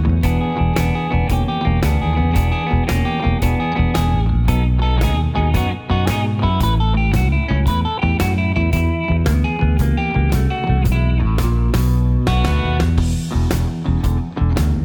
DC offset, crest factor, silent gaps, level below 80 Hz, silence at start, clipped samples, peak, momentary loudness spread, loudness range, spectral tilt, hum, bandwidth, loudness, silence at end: under 0.1%; 14 dB; none; -20 dBFS; 0 s; under 0.1%; -2 dBFS; 2 LU; 1 LU; -7 dB/octave; none; 19.5 kHz; -18 LUFS; 0 s